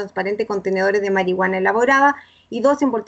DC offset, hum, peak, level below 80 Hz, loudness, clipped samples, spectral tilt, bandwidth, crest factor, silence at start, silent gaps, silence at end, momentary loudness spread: under 0.1%; none; -4 dBFS; -62 dBFS; -18 LUFS; under 0.1%; -5.5 dB/octave; 8.2 kHz; 14 dB; 0 s; none; 0.05 s; 8 LU